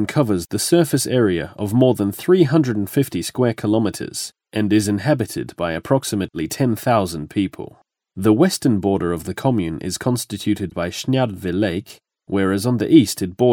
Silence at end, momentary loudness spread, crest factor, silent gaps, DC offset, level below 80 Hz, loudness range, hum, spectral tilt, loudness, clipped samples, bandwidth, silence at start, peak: 0 s; 9 LU; 18 dB; none; under 0.1%; -50 dBFS; 4 LU; none; -6 dB/octave; -19 LUFS; under 0.1%; 19.5 kHz; 0 s; 0 dBFS